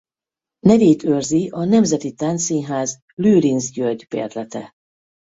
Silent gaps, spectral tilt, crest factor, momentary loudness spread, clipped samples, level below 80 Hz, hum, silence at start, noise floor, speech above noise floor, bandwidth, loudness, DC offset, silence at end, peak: 3.02-3.17 s; -6 dB/octave; 16 dB; 12 LU; under 0.1%; -54 dBFS; none; 0.65 s; -89 dBFS; 72 dB; 8 kHz; -18 LUFS; under 0.1%; 0.75 s; -2 dBFS